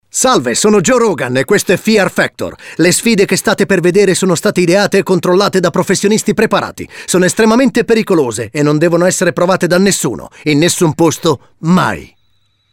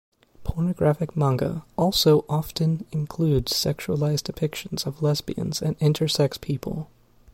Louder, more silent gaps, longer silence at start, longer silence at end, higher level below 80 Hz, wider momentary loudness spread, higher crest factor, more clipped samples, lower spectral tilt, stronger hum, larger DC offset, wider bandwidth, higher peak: first, -11 LUFS vs -24 LUFS; neither; second, 0.15 s vs 0.4 s; first, 0.7 s vs 0.5 s; about the same, -46 dBFS vs -44 dBFS; second, 6 LU vs 9 LU; second, 10 dB vs 18 dB; neither; second, -4.5 dB/octave vs -6 dB/octave; neither; neither; about the same, 17 kHz vs 16.5 kHz; first, 0 dBFS vs -6 dBFS